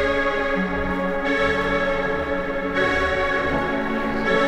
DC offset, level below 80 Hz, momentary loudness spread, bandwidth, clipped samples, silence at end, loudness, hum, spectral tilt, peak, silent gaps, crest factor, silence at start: under 0.1%; -36 dBFS; 4 LU; 12.5 kHz; under 0.1%; 0 s; -22 LUFS; none; -6 dB/octave; -8 dBFS; none; 14 dB; 0 s